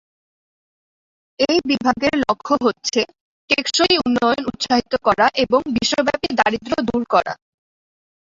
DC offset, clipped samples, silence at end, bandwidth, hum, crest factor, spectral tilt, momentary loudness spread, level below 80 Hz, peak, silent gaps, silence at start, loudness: under 0.1%; under 0.1%; 0.95 s; 7.8 kHz; none; 18 dB; -3 dB/octave; 6 LU; -50 dBFS; -2 dBFS; 3.20-3.48 s; 1.4 s; -18 LUFS